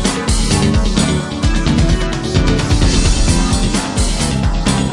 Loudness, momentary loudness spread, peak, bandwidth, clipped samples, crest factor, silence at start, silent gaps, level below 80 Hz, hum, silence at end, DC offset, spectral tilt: -15 LUFS; 3 LU; 0 dBFS; 11.5 kHz; under 0.1%; 12 dB; 0 s; none; -18 dBFS; none; 0 s; under 0.1%; -4.5 dB/octave